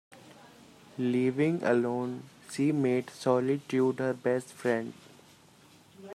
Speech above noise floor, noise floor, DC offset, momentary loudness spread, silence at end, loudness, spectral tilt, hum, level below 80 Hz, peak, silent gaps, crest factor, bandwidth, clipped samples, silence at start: 29 dB; -58 dBFS; under 0.1%; 10 LU; 0 s; -29 LUFS; -7 dB/octave; none; -76 dBFS; -12 dBFS; none; 18 dB; 14 kHz; under 0.1%; 0.1 s